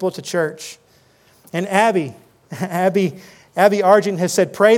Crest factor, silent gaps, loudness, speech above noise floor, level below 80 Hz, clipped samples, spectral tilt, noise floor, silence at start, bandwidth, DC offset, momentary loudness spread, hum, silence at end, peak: 18 dB; none; -18 LUFS; 37 dB; -70 dBFS; under 0.1%; -5 dB/octave; -54 dBFS; 0 s; 17 kHz; under 0.1%; 15 LU; none; 0 s; 0 dBFS